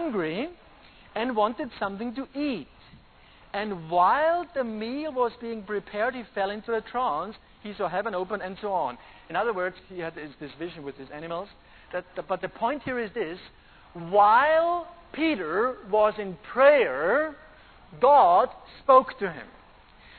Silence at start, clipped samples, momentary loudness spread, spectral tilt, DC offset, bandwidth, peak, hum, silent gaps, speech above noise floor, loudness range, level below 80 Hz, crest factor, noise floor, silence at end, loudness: 0 s; under 0.1%; 18 LU; -8.5 dB/octave; under 0.1%; 4.5 kHz; -6 dBFS; none; none; 28 dB; 11 LU; -58 dBFS; 20 dB; -54 dBFS; 0.7 s; -26 LUFS